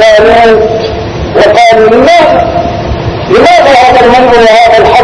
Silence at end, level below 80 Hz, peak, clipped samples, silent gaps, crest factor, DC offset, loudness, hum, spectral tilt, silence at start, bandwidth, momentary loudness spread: 0 s; -24 dBFS; 0 dBFS; 20%; none; 4 dB; under 0.1%; -4 LUFS; none; -5 dB/octave; 0 s; 11 kHz; 10 LU